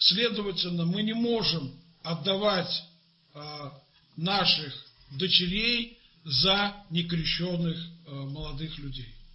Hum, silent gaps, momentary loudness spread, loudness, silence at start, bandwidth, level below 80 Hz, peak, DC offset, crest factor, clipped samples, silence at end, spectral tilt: none; none; 18 LU; -27 LUFS; 0 s; 7.8 kHz; -50 dBFS; -8 dBFS; under 0.1%; 22 dB; under 0.1%; 0.1 s; -6.5 dB/octave